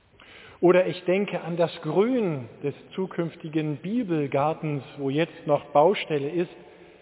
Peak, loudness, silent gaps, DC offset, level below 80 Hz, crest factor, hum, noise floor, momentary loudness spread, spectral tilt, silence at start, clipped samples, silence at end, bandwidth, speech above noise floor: -6 dBFS; -26 LUFS; none; under 0.1%; -68 dBFS; 18 dB; none; -50 dBFS; 11 LU; -11 dB/octave; 0.35 s; under 0.1%; 0.35 s; 4 kHz; 25 dB